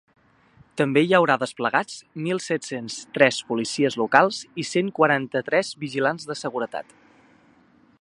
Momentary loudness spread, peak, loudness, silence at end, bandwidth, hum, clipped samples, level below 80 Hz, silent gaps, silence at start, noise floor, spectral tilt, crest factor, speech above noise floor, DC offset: 13 LU; 0 dBFS; -23 LUFS; 1.2 s; 11.5 kHz; none; under 0.1%; -70 dBFS; none; 0.75 s; -57 dBFS; -4.5 dB/octave; 24 dB; 34 dB; under 0.1%